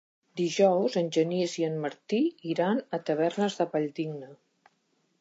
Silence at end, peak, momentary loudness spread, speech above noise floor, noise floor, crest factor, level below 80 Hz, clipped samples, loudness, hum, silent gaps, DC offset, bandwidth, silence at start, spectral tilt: 0.85 s; -10 dBFS; 10 LU; 45 dB; -73 dBFS; 18 dB; -84 dBFS; under 0.1%; -28 LUFS; none; none; under 0.1%; 8 kHz; 0.35 s; -5.5 dB/octave